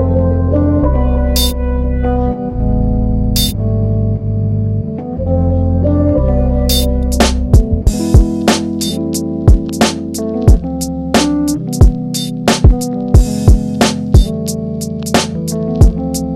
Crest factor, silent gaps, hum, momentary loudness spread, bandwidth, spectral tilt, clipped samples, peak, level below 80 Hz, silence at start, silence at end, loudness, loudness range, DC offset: 12 dB; none; none; 6 LU; 17 kHz; -6 dB/octave; 0.6%; 0 dBFS; -16 dBFS; 0 s; 0 s; -14 LUFS; 3 LU; under 0.1%